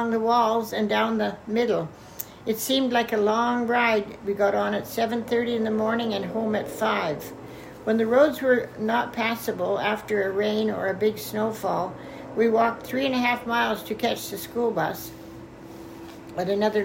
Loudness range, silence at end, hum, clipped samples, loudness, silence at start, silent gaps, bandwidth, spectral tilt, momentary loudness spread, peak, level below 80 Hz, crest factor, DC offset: 3 LU; 0 s; none; under 0.1%; -25 LUFS; 0 s; none; 16.5 kHz; -4.5 dB/octave; 15 LU; -6 dBFS; -60 dBFS; 18 dB; under 0.1%